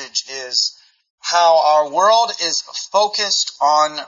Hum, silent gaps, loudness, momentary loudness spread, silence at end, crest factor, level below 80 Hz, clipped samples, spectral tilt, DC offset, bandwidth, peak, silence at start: none; 1.10-1.18 s; -16 LUFS; 8 LU; 0 s; 14 dB; -78 dBFS; under 0.1%; 0.5 dB/octave; under 0.1%; 7.6 kHz; -2 dBFS; 0 s